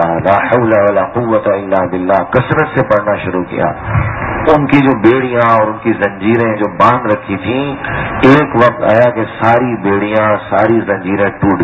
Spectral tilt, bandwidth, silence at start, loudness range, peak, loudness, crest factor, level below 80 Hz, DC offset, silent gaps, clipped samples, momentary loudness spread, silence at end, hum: -8.5 dB/octave; 8 kHz; 0 s; 2 LU; 0 dBFS; -12 LUFS; 12 dB; -34 dBFS; under 0.1%; none; 0.6%; 7 LU; 0 s; none